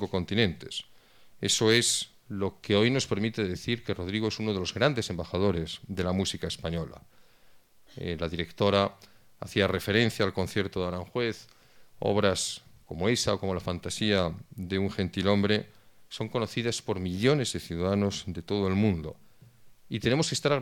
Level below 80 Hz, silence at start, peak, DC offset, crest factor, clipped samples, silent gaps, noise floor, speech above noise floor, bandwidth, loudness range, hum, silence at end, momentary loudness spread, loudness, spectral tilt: -54 dBFS; 0 s; -6 dBFS; under 0.1%; 22 dB; under 0.1%; none; -57 dBFS; 28 dB; 17.5 kHz; 4 LU; none; 0 s; 11 LU; -29 LUFS; -4.5 dB/octave